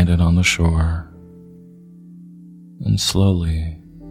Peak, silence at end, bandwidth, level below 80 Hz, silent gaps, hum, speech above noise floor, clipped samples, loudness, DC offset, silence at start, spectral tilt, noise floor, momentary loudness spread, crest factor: -2 dBFS; 0 s; 15 kHz; -28 dBFS; none; none; 25 dB; under 0.1%; -18 LUFS; under 0.1%; 0 s; -5 dB/octave; -42 dBFS; 15 LU; 16 dB